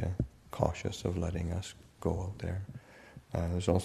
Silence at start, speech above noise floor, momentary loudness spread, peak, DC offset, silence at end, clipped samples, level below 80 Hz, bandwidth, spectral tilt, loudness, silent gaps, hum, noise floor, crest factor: 0 s; 21 dB; 14 LU; -10 dBFS; under 0.1%; 0 s; under 0.1%; -48 dBFS; 13.5 kHz; -6.5 dB/octave; -36 LUFS; none; none; -54 dBFS; 24 dB